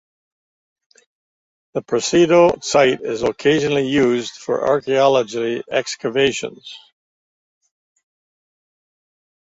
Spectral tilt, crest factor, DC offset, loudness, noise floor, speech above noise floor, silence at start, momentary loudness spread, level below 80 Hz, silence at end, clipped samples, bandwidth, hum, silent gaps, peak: -4.5 dB/octave; 18 dB; under 0.1%; -17 LUFS; under -90 dBFS; over 73 dB; 1.75 s; 13 LU; -56 dBFS; 2.7 s; under 0.1%; 8 kHz; none; none; -2 dBFS